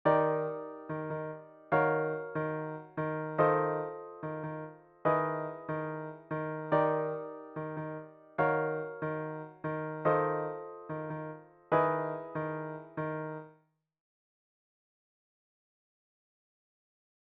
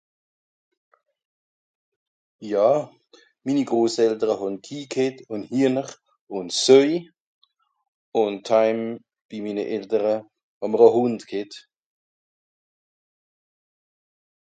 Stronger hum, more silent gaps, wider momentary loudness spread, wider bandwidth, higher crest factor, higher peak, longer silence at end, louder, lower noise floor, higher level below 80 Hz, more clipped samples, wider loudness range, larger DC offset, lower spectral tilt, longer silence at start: neither; second, none vs 6.21-6.27 s, 7.20-7.42 s, 7.88-8.12 s, 9.25-9.29 s, 10.43-10.61 s; second, 13 LU vs 18 LU; second, 4.5 kHz vs 9.4 kHz; about the same, 22 dB vs 24 dB; second, -12 dBFS vs -2 dBFS; first, 3.8 s vs 2.85 s; second, -34 LUFS vs -22 LUFS; first, -68 dBFS vs -57 dBFS; about the same, -74 dBFS vs -74 dBFS; neither; about the same, 7 LU vs 5 LU; neither; first, -7 dB/octave vs -4.5 dB/octave; second, 0.05 s vs 2.4 s